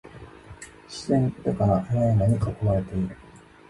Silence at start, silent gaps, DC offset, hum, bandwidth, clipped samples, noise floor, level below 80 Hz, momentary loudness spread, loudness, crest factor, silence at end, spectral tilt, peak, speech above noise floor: 0.05 s; none; under 0.1%; none; 11.5 kHz; under 0.1%; -45 dBFS; -42 dBFS; 22 LU; -24 LUFS; 16 dB; 0.3 s; -8 dB/octave; -10 dBFS; 22 dB